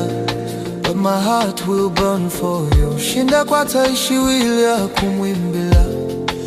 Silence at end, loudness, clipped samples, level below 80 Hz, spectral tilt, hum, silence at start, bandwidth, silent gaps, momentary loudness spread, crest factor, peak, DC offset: 0 s; -17 LUFS; under 0.1%; -26 dBFS; -5 dB/octave; none; 0 s; 16 kHz; none; 7 LU; 14 dB; -2 dBFS; under 0.1%